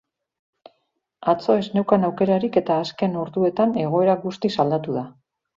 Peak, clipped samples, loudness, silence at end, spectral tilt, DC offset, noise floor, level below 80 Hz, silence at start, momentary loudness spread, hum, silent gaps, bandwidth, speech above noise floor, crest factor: -2 dBFS; under 0.1%; -21 LUFS; 0.45 s; -8 dB/octave; under 0.1%; -73 dBFS; -64 dBFS; 1.2 s; 6 LU; none; none; 7.6 kHz; 52 dB; 20 dB